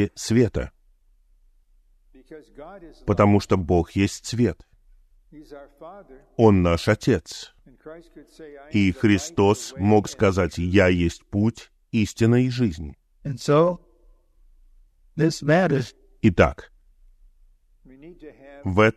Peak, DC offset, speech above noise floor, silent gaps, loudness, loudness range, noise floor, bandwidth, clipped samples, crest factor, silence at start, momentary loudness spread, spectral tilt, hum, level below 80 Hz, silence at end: -2 dBFS; under 0.1%; 37 dB; none; -21 LUFS; 4 LU; -59 dBFS; 13.5 kHz; under 0.1%; 20 dB; 0 s; 24 LU; -6.5 dB/octave; none; -44 dBFS; 0.05 s